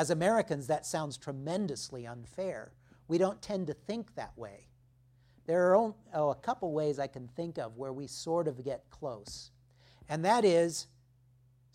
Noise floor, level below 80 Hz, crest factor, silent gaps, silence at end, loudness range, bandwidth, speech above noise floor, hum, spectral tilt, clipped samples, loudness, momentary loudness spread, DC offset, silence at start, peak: -65 dBFS; -66 dBFS; 22 dB; none; 0.9 s; 5 LU; 15.5 kHz; 32 dB; none; -5 dB/octave; under 0.1%; -33 LUFS; 18 LU; under 0.1%; 0 s; -12 dBFS